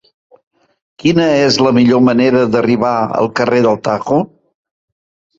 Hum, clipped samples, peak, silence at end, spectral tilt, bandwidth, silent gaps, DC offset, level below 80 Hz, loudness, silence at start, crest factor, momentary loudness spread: none; under 0.1%; 0 dBFS; 1.15 s; -6 dB/octave; 7.8 kHz; none; under 0.1%; -50 dBFS; -12 LUFS; 1.05 s; 14 dB; 6 LU